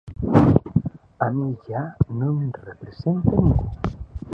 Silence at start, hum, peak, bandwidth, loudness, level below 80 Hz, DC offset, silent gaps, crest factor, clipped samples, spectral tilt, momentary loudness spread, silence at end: 0.05 s; none; 0 dBFS; 6 kHz; -22 LUFS; -34 dBFS; under 0.1%; none; 20 dB; under 0.1%; -10.5 dB/octave; 13 LU; 0 s